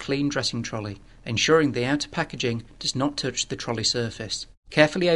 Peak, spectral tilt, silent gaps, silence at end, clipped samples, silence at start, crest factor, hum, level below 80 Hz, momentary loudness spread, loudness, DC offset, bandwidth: 0 dBFS; -4 dB/octave; 4.57-4.63 s; 0 s; under 0.1%; 0 s; 24 dB; none; -52 dBFS; 11 LU; -25 LUFS; 0.2%; 11.5 kHz